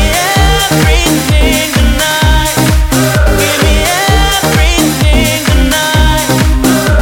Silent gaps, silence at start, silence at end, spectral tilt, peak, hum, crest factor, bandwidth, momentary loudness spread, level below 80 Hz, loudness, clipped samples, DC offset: none; 0 s; 0 s; -4 dB/octave; 0 dBFS; none; 8 dB; 17.5 kHz; 1 LU; -12 dBFS; -9 LUFS; under 0.1%; under 0.1%